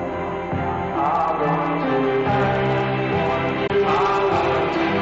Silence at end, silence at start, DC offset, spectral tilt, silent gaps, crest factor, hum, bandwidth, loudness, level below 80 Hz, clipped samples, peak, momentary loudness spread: 0 s; 0 s; under 0.1%; -7.5 dB/octave; none; 14 dB; none; 7.8 kHz; -21 LUFS; -44 dBFS; under 0.1%; -6 dBFS; 6 LU